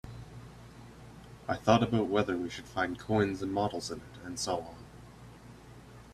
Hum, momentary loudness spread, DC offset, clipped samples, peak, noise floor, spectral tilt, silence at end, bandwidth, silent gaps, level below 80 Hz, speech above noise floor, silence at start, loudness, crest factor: none; 25 LU; under 0.1%; under 0.1%; -8 dBFS; -51 dBFS; -5.5 dB/octave; 0 s; 14.5 kHz; none; -56 dBFS; 20 dB; 0.05 s; -32 LUFS; 26 dB